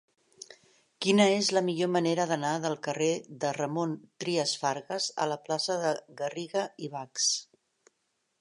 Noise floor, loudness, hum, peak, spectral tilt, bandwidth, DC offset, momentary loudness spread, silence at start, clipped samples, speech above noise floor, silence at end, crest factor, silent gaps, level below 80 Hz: -78 dBFS; -29 LUFS; none; -10 dBFS; -3.5 dB/octave; 11 kHz; under 0.1%; 12 LU; 0.5 s; under 0.1%; 49 dB; 1 s; 22 dB; none; -80 dBFS